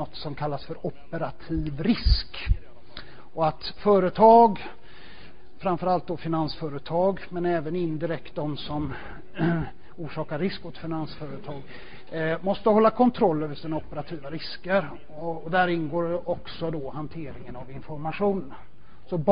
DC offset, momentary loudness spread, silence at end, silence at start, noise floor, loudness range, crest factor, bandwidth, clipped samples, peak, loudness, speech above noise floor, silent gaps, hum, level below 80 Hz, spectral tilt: 2%; 18 LU; 0 s; 0 s; -50 dBFS; 9 LU; 22 dB; 5.2 kHz; under 0.1%; -4 dBFS; -26 LUFS; 24 dB; none; none; -38 dBFS; -11 dB/octave